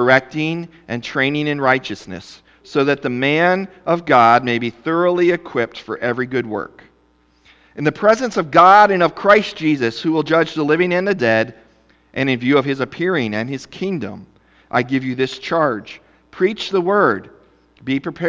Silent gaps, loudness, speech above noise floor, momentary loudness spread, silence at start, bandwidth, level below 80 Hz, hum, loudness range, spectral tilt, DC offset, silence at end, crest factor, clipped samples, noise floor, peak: none; -17 LUFS; 40 dB; 13 LU; 0 s; 8 kHz; -56 dBFS; none; 7 LU; -6 dB/octave; under 0.1%; 0 s; 18 dB; under 0.1%; -57 dBFS; 0 dBFS